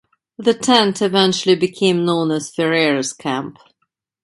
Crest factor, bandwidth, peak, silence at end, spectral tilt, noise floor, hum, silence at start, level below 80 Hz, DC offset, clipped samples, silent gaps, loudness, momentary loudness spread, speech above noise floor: 18 dB; 11.5 kHz; 0 dBFS; 0.7 s; -4 dB/octave; -72 dBFS; none; 0.4 s; -62 dBFS; under 0.1%; under 0.1%; none; -17 LUFS; 9 LU; 55 dB